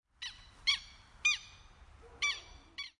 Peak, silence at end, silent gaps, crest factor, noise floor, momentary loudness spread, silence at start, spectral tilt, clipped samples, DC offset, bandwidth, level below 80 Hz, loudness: -18 dBFS; 0.1 s; none; 22 dB; -57 dBFS; 17 LU; 0.2 s; 1.5 dB/octave; under 0.1%; under 0.1%; 11.5 kHz; -62 dBFS; -35 LUFS